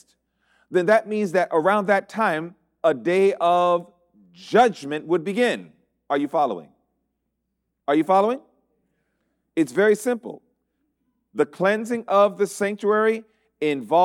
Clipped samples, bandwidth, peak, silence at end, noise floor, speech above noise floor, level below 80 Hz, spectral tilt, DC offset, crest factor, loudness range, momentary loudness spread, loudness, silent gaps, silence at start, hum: under 0.1%; 15.5 kHz; -6 dBFS; 0 s; -77 dBFS; 57 dB; -72 dBFS; -5.5 dB/octave; under 0.1%; 16 dB; 5 LU; 11 LU; -22 LUFS; none; 0.7 s; none